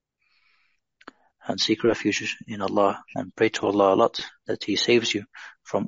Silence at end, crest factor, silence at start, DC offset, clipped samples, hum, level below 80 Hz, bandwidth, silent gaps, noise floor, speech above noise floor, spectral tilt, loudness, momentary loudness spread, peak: 0 s; 20 dB; 1.45 s; under 0.1%; under 0.1%; none; -66 dBFS; 7.8 kHz; none; -69 dBFS; 45 dB; -2.5 dB/octave; -24 LUFS; 13 LU; -6 dBFS